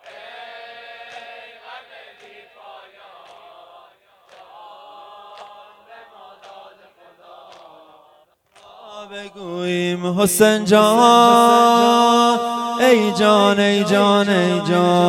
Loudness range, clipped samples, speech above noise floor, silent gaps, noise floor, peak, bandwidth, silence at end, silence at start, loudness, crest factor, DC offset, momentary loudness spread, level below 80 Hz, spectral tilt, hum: 21 LU; under 0.1%; 41 dB; none; -55 dBFS; 0 dBFS; 17 kHz; 0 s; 0.05 s; -14 LUFS; 18 dB; under 0.1%; 26 LU; -62 dBFS; -4.5 dB/octave; none